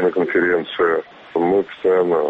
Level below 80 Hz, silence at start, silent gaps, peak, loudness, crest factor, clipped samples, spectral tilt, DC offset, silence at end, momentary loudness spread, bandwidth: -58 dBFS; 0 s; none; -6 dBFS; -19 LUFS; 12 dB; under 0.1%; -7.5 dB/octave; under 0.1%; 0 s; 5 LU; 4.7 kHz